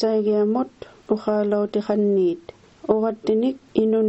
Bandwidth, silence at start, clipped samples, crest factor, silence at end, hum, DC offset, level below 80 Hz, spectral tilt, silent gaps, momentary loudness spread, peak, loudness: 7.8 kHz; 0 s; under 0.1%; 18 dB; 0 s; none; under 0.1%; -62 dBFS; -8.5 dB/octave; none; 6 LU; -4 dBFS; -22 LUFS